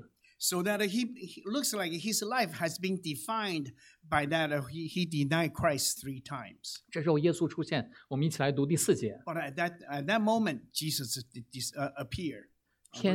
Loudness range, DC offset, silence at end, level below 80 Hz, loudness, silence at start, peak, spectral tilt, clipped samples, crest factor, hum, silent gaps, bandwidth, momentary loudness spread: 2 LU; under 0.1%; 0 s; -64 dBFS; -32 LUFS; 0.4 s; -12 dBFS; -4 dB/octave; under 0.1%; 20 dB; none; none; 17.5 kHz; 10 LU